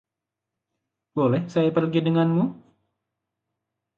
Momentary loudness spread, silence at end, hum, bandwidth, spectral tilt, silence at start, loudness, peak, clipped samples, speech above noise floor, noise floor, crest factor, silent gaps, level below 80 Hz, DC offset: 5 LU; 1.45 s; none; 7.2 kHz; -9 dB/octave; 1.15 s; -23 LUFS; -10 dBFS; under 0.1%; 65 dB; -86 dBFS; 16 dB; none; -68 dBFS; under 0.1%